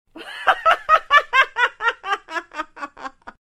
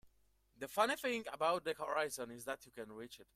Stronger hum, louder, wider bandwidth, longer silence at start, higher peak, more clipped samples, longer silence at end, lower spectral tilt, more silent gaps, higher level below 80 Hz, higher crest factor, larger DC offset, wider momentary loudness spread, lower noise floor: neither; first, -18 LUFS vs -39 LUFS; second, 14.5 kHz vs 16 kHz; about the same, 0.15 s vs 0.05 s; first, 0 dBFS vs -20 dBFS; neither; about the same, 0.1 s vs 0.1 s; second, -0.5 dB/octave vs -2.5 dB/octave; neither; first, -54 dBFS vs -76 dBFS; about the same, 20 dB vs 22 dB; neither; first, 19 LU vs 15 LU; second, -37 dBFS vs -74 dBFS